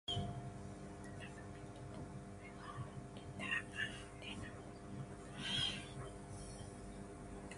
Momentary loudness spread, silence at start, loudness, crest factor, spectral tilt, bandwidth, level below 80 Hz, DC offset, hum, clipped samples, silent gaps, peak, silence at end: 12 LU; 0.05 s; -46 LUFS; 20 dB; -4 dB/octave; 11.5 kHz; -60 dBFS; under 0.1%; none; under 0.1%; none; -26 dBFS; 0 s